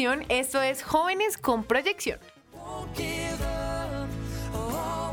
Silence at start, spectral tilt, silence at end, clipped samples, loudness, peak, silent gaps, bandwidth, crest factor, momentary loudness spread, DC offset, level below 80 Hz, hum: 0 s; -4 dB/octave; 0 s; under 0.1%; -28 LUFS; -10 dBFS; none; over 20 kHz; 18 dB; 10 LU; under 0.1%; -42 dBFS; none